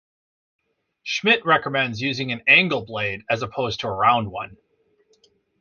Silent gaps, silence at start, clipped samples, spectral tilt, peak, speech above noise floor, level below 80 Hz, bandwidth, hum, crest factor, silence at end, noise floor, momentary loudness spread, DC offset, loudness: none; 1.05 s; under 0.1%; -4.5 dB/octave; -2 dBFS; 42 dB; -56 dBFS; 7.2 kHz; none; 22 dB; 1.05 s; -63 dBFS; 14 LU; under 0.1%; -20 LUFS